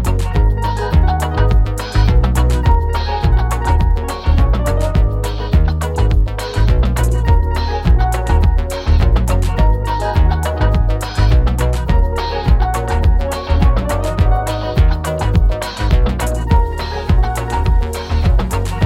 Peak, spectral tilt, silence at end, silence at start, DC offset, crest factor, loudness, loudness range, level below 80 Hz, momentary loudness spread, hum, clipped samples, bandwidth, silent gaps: -2 dBFS; -6.5 dB/octave; 0 s; 0 s; under 0.1%; 12 dB; -16 LUFS; 1 LU; -14 dBFS; 4 LU; none; under 0.1%; 14 kHz; none